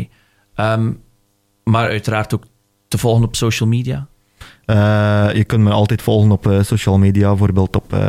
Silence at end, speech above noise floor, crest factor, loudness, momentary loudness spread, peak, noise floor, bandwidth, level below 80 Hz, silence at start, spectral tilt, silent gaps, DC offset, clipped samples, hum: 0 s; 47 dB; 12 dB; -15 LUFS; 12 LU; -4 dBFS; -61 dBFS; 15 kHz; -38 dBFS; 0 s; -6.5 dB/octave; none; under 0.1%; under 0.1%; none